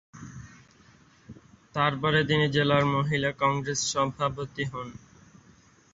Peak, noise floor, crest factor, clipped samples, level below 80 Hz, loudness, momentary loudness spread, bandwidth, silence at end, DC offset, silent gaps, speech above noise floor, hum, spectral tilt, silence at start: -8 dBFS; -58 dBFS; 22 dB; under 0.1%; -56 dBFS; -26 LUFS; 20 LU; 8 kHz; 0.95 s; under 0.1%; none; 32 dB; none; -4.5 dB/octave; 0.15 s